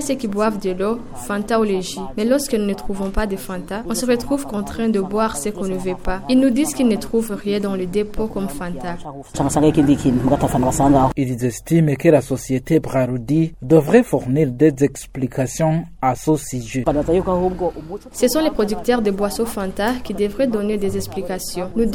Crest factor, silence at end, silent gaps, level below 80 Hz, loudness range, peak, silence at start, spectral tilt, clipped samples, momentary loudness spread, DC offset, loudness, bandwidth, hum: 18 dB; 0 s; none; -36 dBFS; 5 LU; 0 dBFS; 0 s; -6 dB/octave; under 0.1%; 10 LU; under 0.1%; -19 LUFS; 18 kHz; none